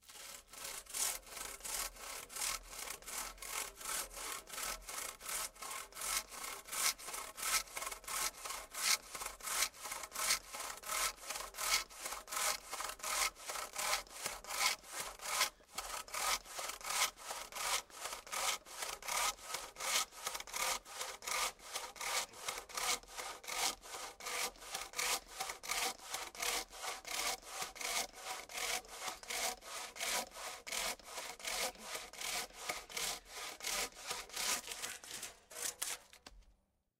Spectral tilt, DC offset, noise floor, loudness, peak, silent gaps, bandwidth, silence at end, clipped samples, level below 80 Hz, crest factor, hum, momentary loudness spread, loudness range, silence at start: 1.5 dB/octave; under 0.1%; -75 dBFS; -39 LUFS; -16 dBFS; none; 16 kHz; 0.5 s; under 0.1%; -66 dBFS; 26 dB; none; 10 LU; 4 LU; 0.05 s